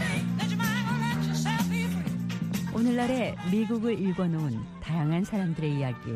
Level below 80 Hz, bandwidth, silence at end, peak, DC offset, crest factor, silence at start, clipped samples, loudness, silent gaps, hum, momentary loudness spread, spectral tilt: -54 dBFS; 15 kHz; 0 s; -16 dBFS; under 0.1%; 12 dB; 0 s; under 0.1%; -29 LUFS; none; none; 4 LU; -6.5 dB/octave